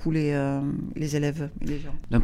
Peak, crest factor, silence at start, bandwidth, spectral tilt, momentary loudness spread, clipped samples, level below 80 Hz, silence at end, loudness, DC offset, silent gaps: -10 dBFS; 16 dB; 0 s; 14.5 kHz; -7 dB/octave; 9 LU; under 0.1%; -34 dBFS; 0 s; -28 LUFS; under 0.1%; none